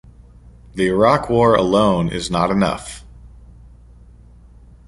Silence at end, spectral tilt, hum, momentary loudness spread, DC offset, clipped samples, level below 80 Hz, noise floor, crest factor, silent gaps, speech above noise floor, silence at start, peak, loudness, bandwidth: 1.6 s; -6 dB/octave; none; 17 LU; under 0.1%; under 0.1%; -40 dBFS; -44 dBFS; 18 dB; none; 28 dB; 0.75 s; -2 dBFS; -17 LUFS; 11.5 kHz